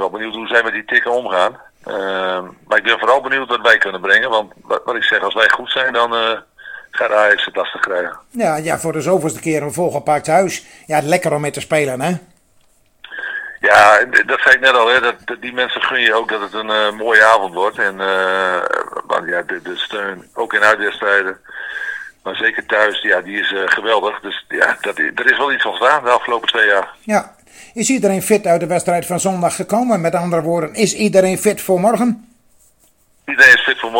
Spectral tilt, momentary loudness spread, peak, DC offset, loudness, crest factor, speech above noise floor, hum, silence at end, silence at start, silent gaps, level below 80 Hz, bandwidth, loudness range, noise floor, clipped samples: -3.5 dB/octave; 13 LU; 0 dBFS; under 0.1%; -15 LUFS; 16 dB; 39 dB; none; 0 s; 0 s; none; -58 dBFS; 17.5 kHz; 5 LU; -55 dBFS; 0.2%